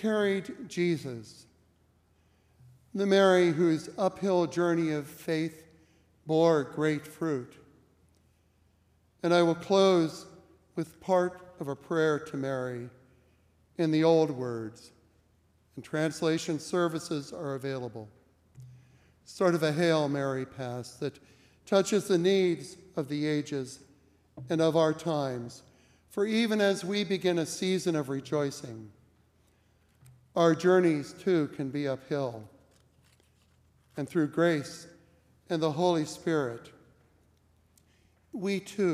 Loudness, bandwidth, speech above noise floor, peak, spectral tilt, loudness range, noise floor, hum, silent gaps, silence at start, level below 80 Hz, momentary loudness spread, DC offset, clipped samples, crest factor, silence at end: -29 LUFS; 15.5 kHz; 39 dB; -12 dBFS; -6 dB/octave; 5 LU; -67 dBFS; none; none; 0 s; -74 dBFS; 17 LU; under 0.1%; under 0.1%; 20 dB; 0 s